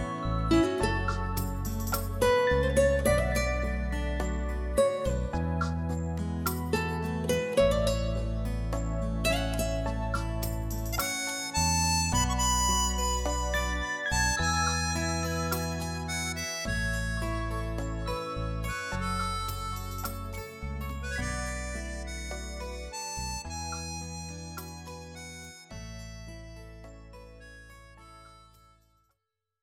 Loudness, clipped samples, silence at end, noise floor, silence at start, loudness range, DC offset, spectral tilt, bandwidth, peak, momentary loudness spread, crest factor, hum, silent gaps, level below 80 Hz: -30 LUFS; under 0.1%; 1.25 s; -84 dBFS; 0 s; 13 LU; under 0.1%; -4 dB/octave; 17 kHz; -12 dBFS; 17 LU; 18 dB; none; none; -36 dBFS